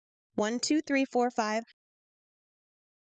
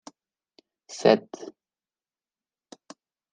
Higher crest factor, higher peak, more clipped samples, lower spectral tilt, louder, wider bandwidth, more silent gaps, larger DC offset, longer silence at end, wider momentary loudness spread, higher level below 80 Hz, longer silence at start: second, 18 dB vs 26 dB; second, -16 dBFS vs -4 dBFS; neither; second, -3.5 dB/octave vs -5 dB/octave; second, -30 LUFS vs -23 LUFS; about the same, 9.2 kHz vs 9.8 kHz; neither; neither; second, 1.5 s vs 1.9 s; second, 7 LU vs 27 LU; about the same, -76 dBFS vs -78 dBFS; second, 0.35 s vs 0.9 s